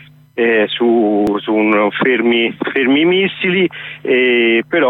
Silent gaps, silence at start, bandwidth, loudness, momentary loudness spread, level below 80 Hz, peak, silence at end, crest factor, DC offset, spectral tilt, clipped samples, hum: none; 0.35 s; 4.1 kHz; -14 LUFS; 5 LU; -56 dBFS; -2 dBFS; 0 s; 10 dB; under 0.1%; -7 dB/octave; under 0.1%; none